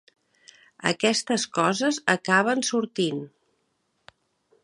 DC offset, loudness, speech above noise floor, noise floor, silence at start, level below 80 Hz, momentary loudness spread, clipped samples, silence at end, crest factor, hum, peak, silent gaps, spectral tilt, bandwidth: under 0.1%; -24 LUFS; 49 dB; -73 dBFS; 0.8 s; -72 dBFS; 7 LU; under 0.1%; 1.35 s; 24 dB; none; -2 dBFS; none; -3.5 dB/octave; 11.5 kHz